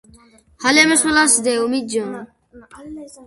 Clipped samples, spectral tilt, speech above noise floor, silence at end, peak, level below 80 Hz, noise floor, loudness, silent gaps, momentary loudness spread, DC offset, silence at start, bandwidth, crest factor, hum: under 0.1%; -1 dB/octave; 32 dB; 0 s; 0 dBFS; -54 dBFS; -50 dBFS; -15 LUFS; none; 23 LU; under 0.1%; 0.6 s; 12 kHz; 18 dB; none